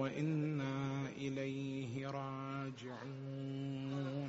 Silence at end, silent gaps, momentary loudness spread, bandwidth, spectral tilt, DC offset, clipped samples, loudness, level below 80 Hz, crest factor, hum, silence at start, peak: 0 s; none; 8 LU; 7.6 kHz; -6.5 dB/octave; under 0.1%; under 0.1%; -42 LUFS; -76 dBFS; 16 dB; none; 0 s; -26 dBFS